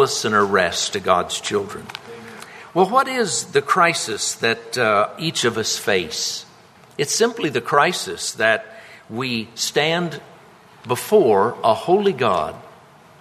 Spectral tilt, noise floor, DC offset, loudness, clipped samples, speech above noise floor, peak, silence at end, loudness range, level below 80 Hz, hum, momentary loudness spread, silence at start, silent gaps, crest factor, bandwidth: -3 dB/octave; -48 dBFS; under 0.1%; -19 LUFS; under 0.1%; 28 dB; -2 dBFS; 0.5 s; 2 LU; -60 dBFS; none; 14 LU; 0 s; none; 20 dB; 13.5 kHz